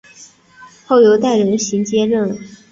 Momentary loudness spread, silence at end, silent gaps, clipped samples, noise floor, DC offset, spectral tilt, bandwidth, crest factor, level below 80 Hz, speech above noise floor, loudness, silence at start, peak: 9 LU; 0.15 s; none; under 0.1%; -43 dBFS; under 0.1%; -5 dB/octave; 7.8 kHz; 14 dB; -58 dBFS; 30 dB; -14 LUFS; 0.2 s; -2 dBFS